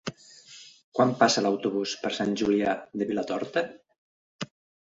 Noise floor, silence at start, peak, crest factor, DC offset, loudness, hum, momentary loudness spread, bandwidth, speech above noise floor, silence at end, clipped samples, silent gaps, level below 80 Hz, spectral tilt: -51 dBFS; 0.05 s; -6 dBFS; 22 dB; under 0.1%; -27 LUFS; none; 18 LU; 8 kHz; 25 dB; 0.4 s; under 0.1%; 0.84-0.92 s, 3.98-4.39 s; -66 dBFS; -4 dB/octave